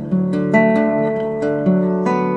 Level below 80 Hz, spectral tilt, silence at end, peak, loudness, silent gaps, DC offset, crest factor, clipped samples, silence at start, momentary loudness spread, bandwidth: -54 dBFS; -9 dB/octave; 0 s; 0 dBFS; -17 LUFS; none; under 0.1%; 16 dB; under 0.1%; 0 s; 6 LU; 7.6 kHz